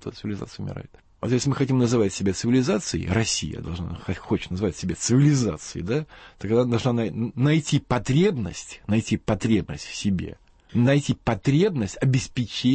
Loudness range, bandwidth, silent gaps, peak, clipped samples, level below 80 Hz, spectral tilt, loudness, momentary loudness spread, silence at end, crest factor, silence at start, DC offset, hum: 2 LU; 8.8 kHz; none; -10 dBFS; under 0.1%; -46 dBFS; -6 dB/octave; -24 LUFS; 12 LU; 0 s; 14 dB; 0 s; under 0.1%; none